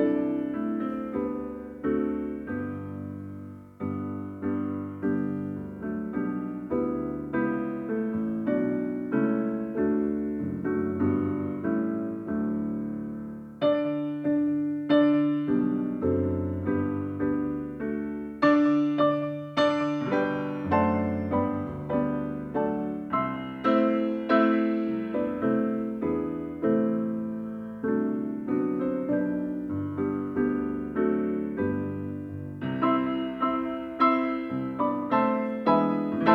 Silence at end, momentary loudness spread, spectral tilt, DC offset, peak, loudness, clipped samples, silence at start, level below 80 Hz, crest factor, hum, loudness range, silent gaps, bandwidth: 0 s; 9 LU; -8.5 dB/octave; under 0.1%; -8 dBFS; -28 LUFS; under 0.1%; 0 s; -58 dBFS; 20 dB; none; 6 LU; none; 6.6 kHz